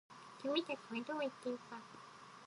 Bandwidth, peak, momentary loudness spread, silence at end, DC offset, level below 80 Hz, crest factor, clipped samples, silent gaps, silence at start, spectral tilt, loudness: 11.5 kHz; -22 dBFS; 17 LU; 0 s; under 0.1%; under -90 dBFS; 22 dB; under 0.1%; none; 0.1 s; -4 dB/octave; -43 LUFS